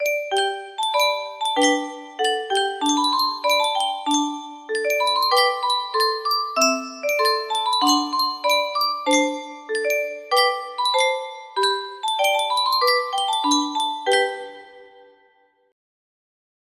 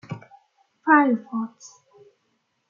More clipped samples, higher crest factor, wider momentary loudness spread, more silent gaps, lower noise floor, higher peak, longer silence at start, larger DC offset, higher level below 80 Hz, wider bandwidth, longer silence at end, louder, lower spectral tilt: neither; about the same, 16 dB vs 20 dB; second, 7 LU vs 21 LU; neither; second, -60 dBFS vs -72 dBFS; about the same, -6 dBFS vs -4 dBFS; about the same, 0 s vs 0.1 s; neither; first, -74 dBFS vs -80 dBFS; first, 15.5 kHz vs 7.2 kHz; first, 1.85 s vs 1.05 s; about the same, -21 LUFS vs -21 LUFS; second, 0.5 dB/octave vs -6.5 dB/octave